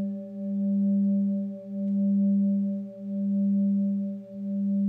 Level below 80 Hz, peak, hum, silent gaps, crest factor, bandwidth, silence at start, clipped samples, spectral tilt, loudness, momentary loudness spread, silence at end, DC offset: -80 dBFS; -18 dBFS; none; none; 8 dB; 0.8 kHz; 0 s; under 0.1%; -13.5 dB/octave; -27 LUFS; 10 LU; 0 s; under 0.1%